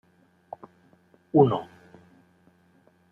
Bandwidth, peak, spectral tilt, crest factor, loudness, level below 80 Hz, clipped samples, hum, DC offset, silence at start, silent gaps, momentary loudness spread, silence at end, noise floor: 4 kHz; -6 dBFS; -10.5 dB/octave; 24 dB; -23 LUFS; -68 dBFS; under 0.1%; none; under 0.1%; 1.35 s; none; 25 LU; 1.45 s; -62 dBFS